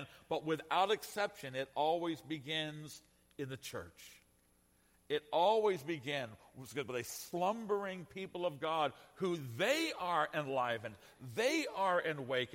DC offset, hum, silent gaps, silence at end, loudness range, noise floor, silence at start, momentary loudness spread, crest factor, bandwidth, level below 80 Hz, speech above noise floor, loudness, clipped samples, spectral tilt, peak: under 0.1%; none; none; 0 s; 5 LU; -72 dBFS; 0 s; 14 LU; 18 dB; 16.5 kHz; -76 dBFS; 34 dB; -37 LUFS; under 0.1%; -4 dB/octave; -20 dBFS